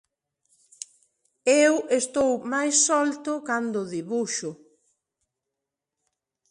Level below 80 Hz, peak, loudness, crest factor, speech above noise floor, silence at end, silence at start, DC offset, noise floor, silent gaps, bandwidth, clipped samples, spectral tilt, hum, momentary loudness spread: -70 dBFS; -8 dBFS; -23 LUFS; 20 dB; 62 dB; 1.95 s; 1.45 s; under 0.1%; -86 dBFS; none; 11.5 kHz; under 0.1%; -2.5 dB/octave; none; 19 LU